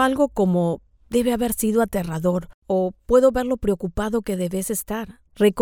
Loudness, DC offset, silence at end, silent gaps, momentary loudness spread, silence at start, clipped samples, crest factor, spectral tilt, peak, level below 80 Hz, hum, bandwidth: -22 LUFS; under 0.1%; 0 s; 2.54-2.62 s; 8 LU; 0 s; under 0.1%; 18 dB; -6 dB/octave; -4 dBFS; -42 dBFS; none; 19.5 kHz